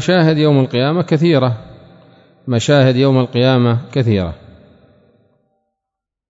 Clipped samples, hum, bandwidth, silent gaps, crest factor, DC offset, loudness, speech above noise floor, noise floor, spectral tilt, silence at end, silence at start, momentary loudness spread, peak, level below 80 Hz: under 0.1%; none; 7.8 kHz; none; 14 dB; under 0.1%; -14 LUFS; 69 dB; -82 dBFS; -7 dB/octave; 1.95 s; 0 s; 8 LU; 0 dBFS; -48 dBFS